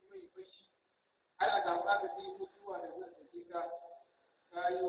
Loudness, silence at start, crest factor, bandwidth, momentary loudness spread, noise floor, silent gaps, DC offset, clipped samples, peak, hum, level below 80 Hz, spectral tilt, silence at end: -38 LUFS; 0.1 s; 20 dB; 4 kHz; 22 LU; -79 dBFS; none; under 0.1%; under 0.1%; -20 dBFS; none; -82 dBFS; -0.5 dB/octave; 0 s